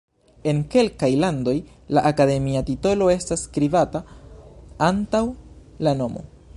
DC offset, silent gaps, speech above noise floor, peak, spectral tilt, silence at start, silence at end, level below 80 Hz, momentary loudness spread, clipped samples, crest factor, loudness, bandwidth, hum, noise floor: under 0.1%; none; 22 dB; -4 dBFS; -6 dB/octave; 0.45 s; 0.3 s; -44 dBFS; 9 LU; under 0.1%; 18 dB; -22 LUFS; 11.5 kHz; none; -43 dBFS